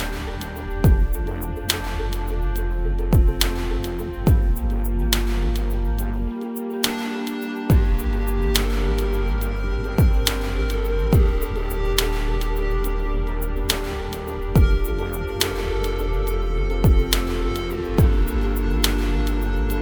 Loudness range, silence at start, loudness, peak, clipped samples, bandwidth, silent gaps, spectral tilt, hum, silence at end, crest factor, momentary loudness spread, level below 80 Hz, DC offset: 2 LU; 0 s; -23 LUFS; 0 dBFS; under 0.1%; over 20 kHz; none; -5.5 dB/octave; none; 0 s; 20 dB; 8 LU; -22 dBFS; under 0.1%